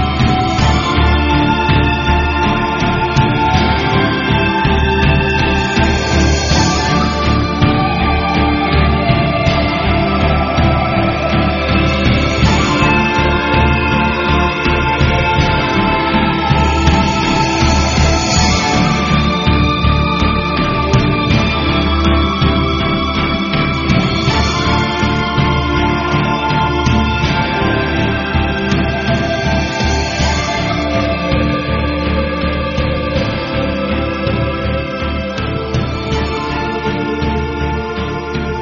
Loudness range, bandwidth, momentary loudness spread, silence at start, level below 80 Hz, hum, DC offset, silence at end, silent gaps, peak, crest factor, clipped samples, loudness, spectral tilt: 4 LU; 7.4 kHz; 5 LU; 0 s; -20 dBFS; none; under 0.1%; 0 s; none; 0 dBFS; 14 dB; under 0.1%; -14 LUFS; -4.5 dB/octave